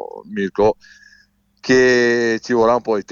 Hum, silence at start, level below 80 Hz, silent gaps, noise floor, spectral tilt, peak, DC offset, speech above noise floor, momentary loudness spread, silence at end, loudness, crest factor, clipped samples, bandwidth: 50 Hz at -55 dBFS; 0 s; -48 dBFS; none; -55 dBFS; -5 dB/octave; -4 dBFS; under 0.1%; 39 dB; 15 LU; 0 s; -16 LUFS; 14 dB; under 0.1%; 7.4 kHz